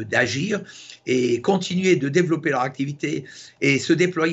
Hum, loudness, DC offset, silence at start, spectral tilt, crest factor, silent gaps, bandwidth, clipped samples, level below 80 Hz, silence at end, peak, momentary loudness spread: none; -22 LUFS; under 0.1%; 0 s; -5 dB/octave; 18 dB; none; 8.2 kHz; under 0.1%; -66 dBFS; 0 s; -4 dBFS; 10 LU